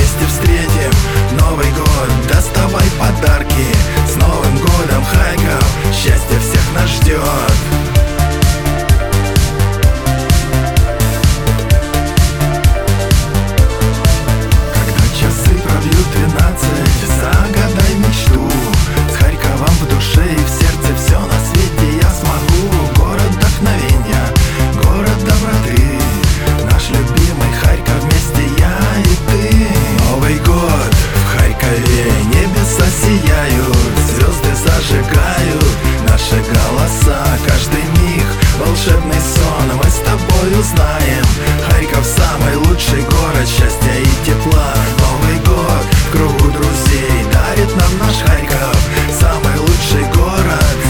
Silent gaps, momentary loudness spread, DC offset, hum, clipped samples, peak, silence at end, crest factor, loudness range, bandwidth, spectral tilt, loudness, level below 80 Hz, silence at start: none; 2 LU; under 0.1%; none; under 0.1%; 0 dBFS; 0 s; 10 dB; 1 LU; over 20 kHz; -5 dB/octave; -12 LUFS; -14 dBFS; 0 s